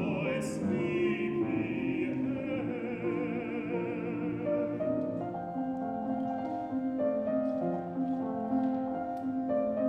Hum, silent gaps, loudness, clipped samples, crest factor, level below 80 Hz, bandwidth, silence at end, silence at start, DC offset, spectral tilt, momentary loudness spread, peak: none; none; -33 LUFS; under 0.1%; 12 dB; -64 dBFS; 11.5 kHz; 0 s; 0 s; under 0.1%; -7.5 dB/octave; 4 LU; -20 dBFS